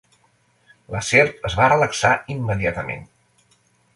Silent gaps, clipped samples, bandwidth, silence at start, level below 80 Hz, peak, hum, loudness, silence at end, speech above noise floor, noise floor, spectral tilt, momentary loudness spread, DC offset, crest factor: none; under 0.1%; 11.5 kHz; 0.9 s; -44 dBFS; -2 dBFS; none; -19 LUFS; 0.9 s; 42 dB; -61 dBFS; -4.5 dB/octave; 14 LU; under 0.1%; 20 dB